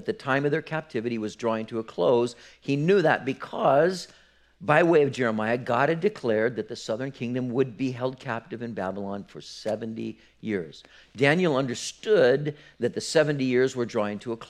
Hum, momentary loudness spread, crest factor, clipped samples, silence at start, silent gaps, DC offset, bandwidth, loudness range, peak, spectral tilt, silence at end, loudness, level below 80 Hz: none; 13 LU; 22 dB; under 0.1%; 0 s; none; under 0.1%; 12.5 kHz; 7 LU; -4 dBFS; -5.5 dB/octave; 0.05 s; -26 LUFS; -66 dBFS